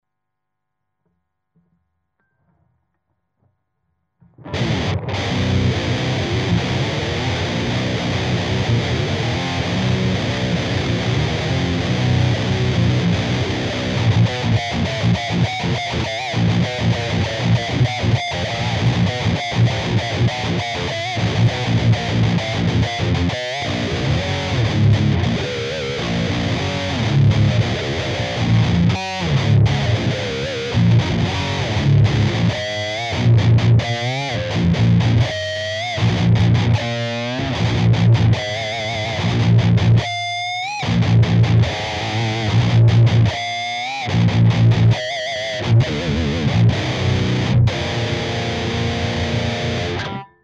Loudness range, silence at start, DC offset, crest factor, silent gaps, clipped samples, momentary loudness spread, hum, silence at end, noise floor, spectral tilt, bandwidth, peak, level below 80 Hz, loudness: 3 LU; 4.4 s; under 0.1%; 12 dB; none; under 0.1%; 7 LU; none; 0.2 s; -80 dBFS; -6 dB/octave; 8 kHz; -6 dBFS; -36 dBFS; -18 LUFS